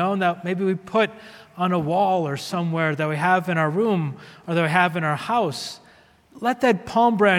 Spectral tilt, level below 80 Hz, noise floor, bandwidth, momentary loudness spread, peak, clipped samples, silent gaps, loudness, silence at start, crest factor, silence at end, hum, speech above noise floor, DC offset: -6 dB/octave; -64 dBFS; -53 dBFS; 16 kHz; 9 LU; -4 dBFS; under 0.1%; none; -22 LUFS; 0 s; 18 dB; 0 s; none; 32 dB; under 0.1%